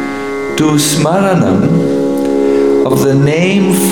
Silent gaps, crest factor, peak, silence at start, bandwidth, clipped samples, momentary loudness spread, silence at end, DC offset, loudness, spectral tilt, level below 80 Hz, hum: none; 10 dB; 0 dBFS; 0 s; 19 kHz; under 0.1%; 3 LU; 0 s; 1%; -11 LUFS; -5.5 dB/octave; -46 dBFS; none